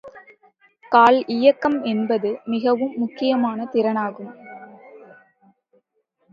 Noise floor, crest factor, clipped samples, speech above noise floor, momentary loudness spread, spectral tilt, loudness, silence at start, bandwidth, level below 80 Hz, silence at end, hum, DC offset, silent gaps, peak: -69 dBFS; 20 dB; under 0.1%; 50 dB; 23 LU; -7 dB/octave; -20 LUFS; 0.05 s; 7.2 kHz; -70 dBFS; 1.35 s; none; under 0.1%; none; -2 dBFS